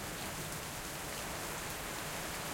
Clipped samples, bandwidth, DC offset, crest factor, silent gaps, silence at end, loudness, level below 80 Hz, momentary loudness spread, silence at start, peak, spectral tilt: under 0.1%; 17 kHz; under 0.1%; 16 dB; none; 0 s; -40 LUFS; -56 dBFS; 1 LU; 0 s; -26 dBFS; -2.5 dB/octave